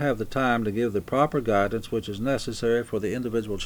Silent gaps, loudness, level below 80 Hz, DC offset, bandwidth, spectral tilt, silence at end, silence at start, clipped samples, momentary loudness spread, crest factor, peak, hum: none; -26 LUFS; -46 dBFS; under 0.1%; over 20 kHz; -6 dB/octave; 0 s; 0 s; under 0.1%; 5 LU; 18 dB; -8 dBFS; none